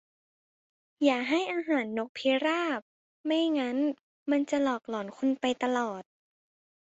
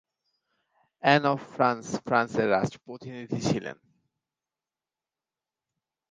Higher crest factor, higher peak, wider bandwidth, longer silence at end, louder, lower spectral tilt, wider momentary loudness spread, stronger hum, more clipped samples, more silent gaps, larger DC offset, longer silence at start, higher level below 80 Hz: second, 18 dB vs 26 dB; second, -12 dBFS vs -4 dBFS; second, 8 kHz vs 9.8 kHz; second, 0.8 s vs 2.4 s; second, -30 LUFS vs -26 LUFS; second, -4 dB/octave vs -5.5 dB/octave; second, 9 LU vs 18 LU; neither; neither; first, 2.09-2.15 s, 2.82-3.24 s, 4.01-4.26 s vs none; neither; about the same, 1 s vs 1.05 s; second, -76 dBFS vs -64 dBFS